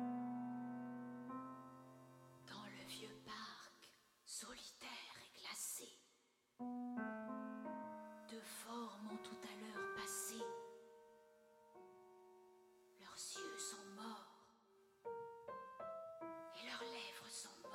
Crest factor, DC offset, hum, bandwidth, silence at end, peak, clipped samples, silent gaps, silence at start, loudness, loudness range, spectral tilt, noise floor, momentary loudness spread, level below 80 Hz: 18 dB; under 0.1%; none; 16 kHz; 0 s; -34 dBFS; under 0.1%; none; 0 s; -51 LUFS; 4 LU; -2.5 dB/octave; -79 dBFS; 18 LU; -88 dBFS